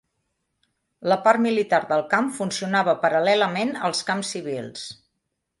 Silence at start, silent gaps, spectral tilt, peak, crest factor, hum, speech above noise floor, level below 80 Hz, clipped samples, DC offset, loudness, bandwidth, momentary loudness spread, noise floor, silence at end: 1 s; none; -4 dB/octave; -4 dBFS; 20 dB; none; 56 dB; -70 dBFS; under 0.1%; under 0.1%; -22 LUFS; 11.5 kHz; 12 LU; -78 dBFS; 0.65 s